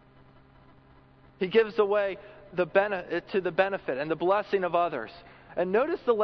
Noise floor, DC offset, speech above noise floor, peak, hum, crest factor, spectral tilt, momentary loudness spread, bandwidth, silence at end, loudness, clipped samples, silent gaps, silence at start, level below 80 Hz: -56 dBFS; under 0.1%; 30 dB; -8 dBFS; none; 20 dB; -7.5 dB/octave; 10 LU; 6 kHz; 0 s; -28 LUFS; under 0.1%; none; 1.4 s; -64 dBFS